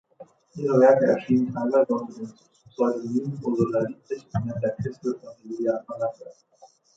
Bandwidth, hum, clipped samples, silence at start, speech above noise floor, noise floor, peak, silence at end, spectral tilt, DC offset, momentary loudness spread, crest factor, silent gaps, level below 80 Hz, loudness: 7.8 kHz; none; under 0.1%; 0.2 s; 26 dB; -50 dBFS; -4 dBFS; 0.65 s; -8.5 dB/octave; under 0.1%; 18 LU; 20 dB; none; -60 dBFS; -24 LUFS